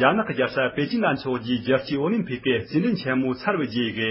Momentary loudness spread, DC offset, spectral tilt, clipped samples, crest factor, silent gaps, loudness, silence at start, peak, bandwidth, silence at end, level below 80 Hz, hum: 2 LU; under 0.1%; -10.5 dB/octave; under 0.1%; 20 dB; none; -24 LUFS; 0 s; -4 dBFS; 5.8 kHz; 0 s; -56 dBFS; none